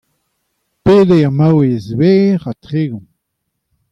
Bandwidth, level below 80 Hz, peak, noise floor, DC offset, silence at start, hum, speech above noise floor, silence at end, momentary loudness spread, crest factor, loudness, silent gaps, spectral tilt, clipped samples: 7.8 kHz; -46 dBFS; -2 dBFS; -72 dBFS; under 0.1%; 0.85 s; none; 61 dB; 0.95 s; 11 LU; 12 dB; -12 LUFS; none; -9 dB/octave; under 0.1%